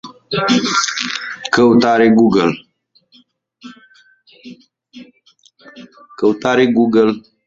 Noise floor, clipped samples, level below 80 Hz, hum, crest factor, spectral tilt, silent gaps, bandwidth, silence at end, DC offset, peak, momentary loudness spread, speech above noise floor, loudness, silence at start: -54 dBFS; under 0.1%; -56 dBFS; none; 16 dB; -4.5 dB/octave; none; 7.8 kHz; 0.25 s; under 0.1%; 0 dBFS; 10 LU; 41 dB; -14 LUFS; 0.05 s